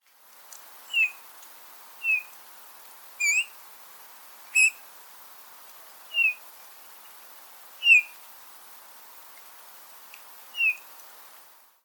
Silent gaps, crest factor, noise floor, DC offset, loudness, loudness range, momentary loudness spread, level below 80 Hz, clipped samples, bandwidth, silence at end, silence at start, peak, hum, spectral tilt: none; 24 dB; -53 dBFS; under 0.1%; -23 LUFS; 7 LU; 25 LU; under -90 dBFS; under 0.1%; 19 kHz; 1.05 s; 0.9 s; -8 dBFS; none; 5 dB/octave